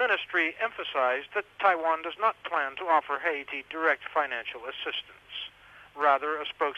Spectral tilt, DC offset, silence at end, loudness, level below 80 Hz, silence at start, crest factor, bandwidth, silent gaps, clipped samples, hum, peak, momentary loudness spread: -3.5 dB/octave; under 0.1%; 0 s; -28 LUFS; -72 dBFS; 0 s; 18 dB; 12.5 kHz; none; under 0.1%; 50 Hz at -70 dBFS; -10 dBFS; 12 LU